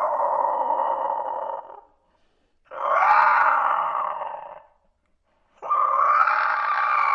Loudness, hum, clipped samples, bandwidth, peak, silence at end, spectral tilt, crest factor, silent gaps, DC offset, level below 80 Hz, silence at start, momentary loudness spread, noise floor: -21 LUFS; none; under 0.1%; 7 kHz; -6 dBFS; 0 s; -3 dB/octave; 18 dB; none; under 0.1%; -72 dBFS; 0 s; 17 LU; -67 dBFS